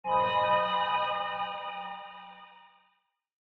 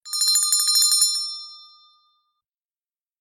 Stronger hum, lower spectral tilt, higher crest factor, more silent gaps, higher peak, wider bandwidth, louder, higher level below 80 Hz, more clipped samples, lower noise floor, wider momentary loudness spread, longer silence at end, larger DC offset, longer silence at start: neither; first, -5.5 dB/octave vs 6.5 dB/octave; about the same, 18 dB vs 18 dB; neither; second, -14 dBFS vs -6 dBFS; second, 6 kHz vs 16.5 kHz; second, -29 LUFS vs -17 LUFS; first, -68 dBFS vs -86 dBFS; neither; second, -74 dBFS vs under -90 dBFS; first, 21 LU vs 17 LU; second, 0.95 s vs 1.6 s; neither; about the same, 0.05 s vs 0.05 s